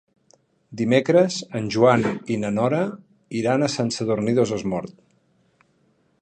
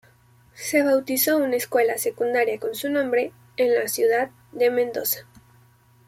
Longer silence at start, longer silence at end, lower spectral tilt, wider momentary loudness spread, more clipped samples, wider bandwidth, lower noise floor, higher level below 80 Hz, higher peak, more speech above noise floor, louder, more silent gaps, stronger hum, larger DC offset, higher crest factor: first, 0.7 s vs 0.55 s; first, 1.3 s vs 0.85 s; first, -6 dB/octave vs -2.5 dB/octave; first, 11 LU vs 6 LU; neither; second, 9.6 kHz vs 16.5 kHz; first, -64 dBFS vs -56 dBFS; first, -60 dBFS vs -68 dBFS; about the same, -4 dBFS vs -6 dBFS; first, 43 dB vs 34 dB; about the same, -22 LUFS vs -23 LUFS; neither; neither; neither; about the same, 20 dB vs 16 dB